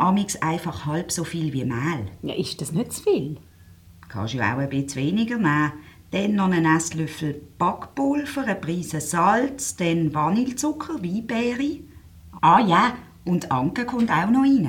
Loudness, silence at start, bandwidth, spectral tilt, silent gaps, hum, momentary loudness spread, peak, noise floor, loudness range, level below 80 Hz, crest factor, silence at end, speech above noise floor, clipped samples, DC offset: -23 LUFS; 0 s; 18 kHz; -5.5 dB/octave; none; none; 10 LU; -4 dBFS; -49 dBFS; 5 LU; -54 dBFS; 18 dB; 0 s; 26 dB; under 0.1%; under 0.1%